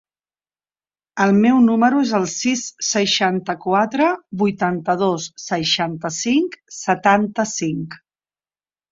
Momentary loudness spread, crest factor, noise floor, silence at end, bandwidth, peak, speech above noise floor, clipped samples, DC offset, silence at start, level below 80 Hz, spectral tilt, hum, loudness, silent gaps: 10 LU; 18 dB; under -90 dBFS; 0.95 s; 7.8 kHz; -2 dBFS; over 72 dB; under 0.1%; under 0.1%; 1.15 s; -60 dBFS; -4 dB/octave; 50 Hz at -65 dBFS; -18 LUFS; none